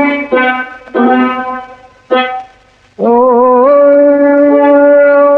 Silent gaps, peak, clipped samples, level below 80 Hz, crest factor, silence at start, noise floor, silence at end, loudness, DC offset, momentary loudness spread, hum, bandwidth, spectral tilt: none; 0 dBFS; under 0.1%; -52 dBFS; 8 dB; 0 s; -44 dBFS; 0 s; -8 LUFS; under 0.1%; 12 LU; none; 4.4 kHz; -7 dB/octave